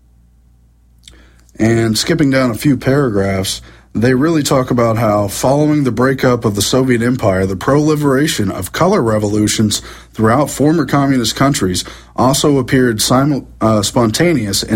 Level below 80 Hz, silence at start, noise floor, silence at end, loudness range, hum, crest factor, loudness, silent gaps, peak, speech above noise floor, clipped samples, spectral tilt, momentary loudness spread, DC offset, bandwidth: -38 dBFS; 1.6 s; -48 dBFS; 0 s; 1 LU; none; 14 dB; -13 LUFS; none; 0 dBFS; 35 dB; under 0.1%; -5 dB/octave; 4 LU; under 0.1%; 16.5 kHz